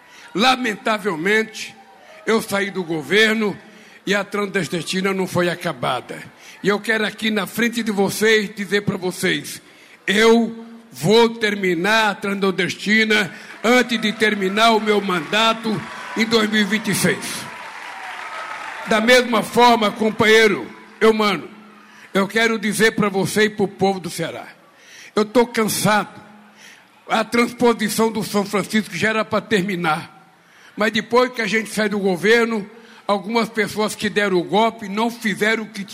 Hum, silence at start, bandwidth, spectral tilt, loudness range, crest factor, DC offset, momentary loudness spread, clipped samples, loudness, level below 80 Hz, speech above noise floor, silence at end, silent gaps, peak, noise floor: none; 0.2 s; 16 kHz; -4 dB/octave; 4 LU; 16 dB; under 0.1%; 13 LU; under 0.1%; -18 LUFS; -58 dBFS; 30 dB; 0 s; none; -4 dBFS; -49 dBFS